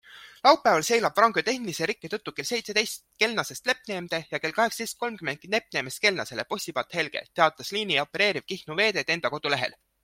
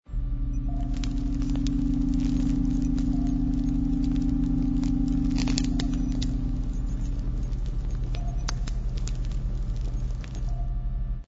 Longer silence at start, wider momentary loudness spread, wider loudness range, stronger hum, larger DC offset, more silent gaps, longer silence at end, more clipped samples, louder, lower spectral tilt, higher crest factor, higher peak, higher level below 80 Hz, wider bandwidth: about the same, 0.1 s vs 0.1 s; first, 10 LU vs 7 LU; about the same, 4 LU vs 6 LU; neither; neither; neither; first, 0.3 s vs 0 s; neither; first, -26 LUFS vs -29 LUFS; second, -2.5 dB/octave vs -6.5 dB/octave; about the same, 24 dB vs 20 dB; about the same, -4 dBFS vs -6 dBFS; second, -68 dBFS vs -28 dBFS; first, 16.5 kHz vs 7.8 kHz